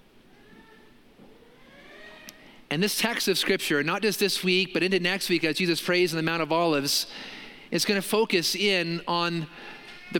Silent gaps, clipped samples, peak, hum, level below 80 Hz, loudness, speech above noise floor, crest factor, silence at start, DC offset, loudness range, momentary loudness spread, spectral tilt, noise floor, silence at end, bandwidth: none; under 0.1%; -8 dBFS; none; -64 dBFS; -25 LUFS; 29 dB; 20 dB; 0.55 s; under 0.1%; 5 LU; 17 LU; -3.5 dB/octave; -55 dBFS; 0 s; 17 kHz